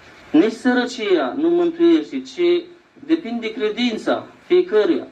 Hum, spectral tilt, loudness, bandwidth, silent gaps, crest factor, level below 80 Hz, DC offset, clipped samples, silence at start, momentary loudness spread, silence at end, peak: none; -5 dB/octave; -19 LUFS; 8.6 kHz; none; 14 dB; -64 dBFS; under 0.1%; under 0.1%; 0.3 s; 7 LU; 0 s; -4 dBFS